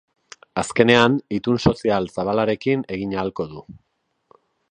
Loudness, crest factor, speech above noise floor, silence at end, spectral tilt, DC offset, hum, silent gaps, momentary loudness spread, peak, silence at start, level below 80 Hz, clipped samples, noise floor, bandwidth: -20 LUFS; 22 dB; 40 dB; 1 s; -5.5 dB/octave; under 0.1%; none; none; 14 LU; 0 dBFS; 0.55 s; -48 dBFS; under 0.1%; -60 dBFS; 10 kHz